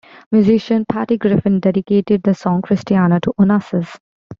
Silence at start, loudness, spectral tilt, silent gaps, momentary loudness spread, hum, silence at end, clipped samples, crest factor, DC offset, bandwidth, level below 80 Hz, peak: 0.3 s; -16 LUFS; -9 dB/octave; 4.00-4.30 s; 4 LU; none; 0.05 s; under 0.1%; 12 dB; under 0.1%; 7.2 kHz; -52 dBFS; -4 dBFS